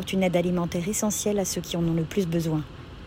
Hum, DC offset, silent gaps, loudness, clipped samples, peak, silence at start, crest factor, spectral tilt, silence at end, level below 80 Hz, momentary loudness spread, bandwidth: none; under 0.1%; none; -26 LUFS; under 0.1%; -10 dBFS; 0 s; 16 dB; -5 dB/octave; 0 s; -48 dBFS; 5 LU; 16.5 kHz